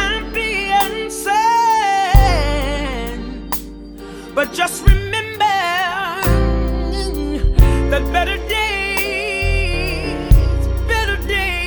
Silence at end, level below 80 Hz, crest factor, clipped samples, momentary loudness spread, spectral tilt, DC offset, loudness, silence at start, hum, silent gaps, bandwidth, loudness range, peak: 0 s; -20 dBFS; 16 dB; under 0.1%; 9 LU; -4.5 dB/octave; under 0.1%; -17 LUFS; 0 s; none; none; over 20 kHz; 3 LU; 0 dBFS